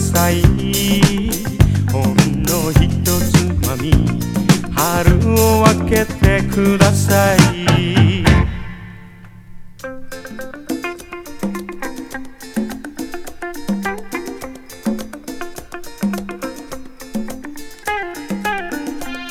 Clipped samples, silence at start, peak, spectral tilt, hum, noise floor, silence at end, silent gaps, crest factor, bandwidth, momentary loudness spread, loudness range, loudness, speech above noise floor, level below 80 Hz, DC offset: under 0.1%; 0 s; 0 dBFS; -5.5 dB/octave; none; -38 dBFS; 0 s; none; 16 dB; 18.5 kHz; 18 LU; 14 LU; -16 LUFS; 25 dB; -26 dBFS; under 0.1%